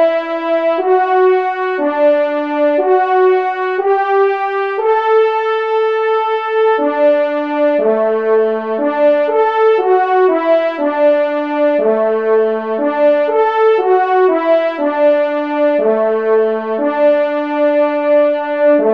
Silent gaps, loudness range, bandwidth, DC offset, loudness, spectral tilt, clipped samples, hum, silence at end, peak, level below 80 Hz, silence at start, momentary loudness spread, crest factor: none; 1 LU; 5.6 kHz; 0.2%; -13 LUFS; -6.5 dB/octave; under 0.1%; none; 0 s; -2 dBFS; -70 dBFS; 0 s; 5 LU; 12 dB